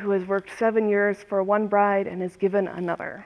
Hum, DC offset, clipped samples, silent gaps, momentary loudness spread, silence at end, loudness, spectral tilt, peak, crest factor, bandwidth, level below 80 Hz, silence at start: none; under 0.1%; under 0.1%; none; 7 LU; 0 s; -24 LUFS; -7.5 dB/octave; -8 dBFS; 14 dB; 11 kHz; -66 dBFS; 0 s